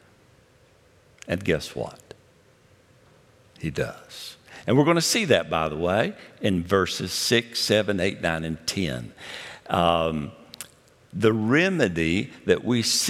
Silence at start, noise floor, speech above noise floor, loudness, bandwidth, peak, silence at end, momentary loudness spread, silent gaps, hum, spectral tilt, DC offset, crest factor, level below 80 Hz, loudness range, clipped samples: 1.25 s; -57 dBFS; 34 dB; -24 LUFS; 16.5 kHz; -4 dBFS; 0 s; 18 LU; none; none; -4 dB/octave; under 0.1%; 22 dB; -54 dBFS; 11 LU; under 0.1%